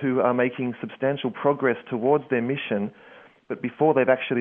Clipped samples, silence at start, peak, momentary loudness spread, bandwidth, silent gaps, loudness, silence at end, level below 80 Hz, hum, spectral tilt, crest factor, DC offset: under 0.1%; 0 s; -6 dBFS; 10 LU; 3.8 kHz; none; -24 LUFS; 0 s; -72 dBFS; none; -10 dB/octave; 18 dB; under 0.1%